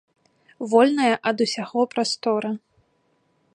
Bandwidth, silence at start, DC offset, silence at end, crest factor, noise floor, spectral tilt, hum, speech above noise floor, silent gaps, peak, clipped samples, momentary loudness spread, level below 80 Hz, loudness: 11 kHz; 0.6 s; under 0.1%; 1 s; 20 dB; -67 dBFS; -4 dB/octave; none; 46 dB; none; -4 dBFS; under 0.1%; 12 LU; -74 dBFS; -22 LUFS